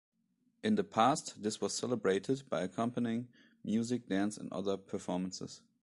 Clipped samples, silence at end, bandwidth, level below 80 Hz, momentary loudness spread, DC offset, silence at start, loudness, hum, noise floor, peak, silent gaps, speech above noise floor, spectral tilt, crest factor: under 0.1%; 0.25 s; 11.5 kHz; -72 dBFS; 10 LU; under 0.1%; 0.65 s; -35 LUFS; none; -77 dBFS; -14 dBFS; none; 42 dB; -5 dB/octave; 22 dB